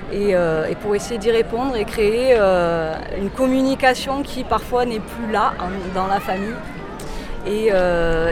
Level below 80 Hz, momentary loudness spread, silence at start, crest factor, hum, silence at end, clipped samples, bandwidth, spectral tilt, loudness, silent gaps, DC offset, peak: -34 dBFS; 10 LU; 0 s; 16 dB; none; 0 s; under 0.1%; 16 kHz; -5.5 dB/octave; -19 LUFS; none; under 0.1%; -4 dBFS